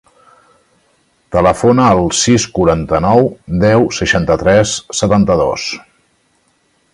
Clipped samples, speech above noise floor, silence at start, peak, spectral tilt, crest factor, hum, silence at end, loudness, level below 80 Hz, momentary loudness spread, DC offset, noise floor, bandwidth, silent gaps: under 0.1%; 46 dB; 1.3 s; 0 dBFS; -5 dB/octave; 14 dB; none; 1.15 s; -12 LUFS; -34 dBFS; 6 LU; under 0.1%; -58 dBFS; 11.5 kHz; none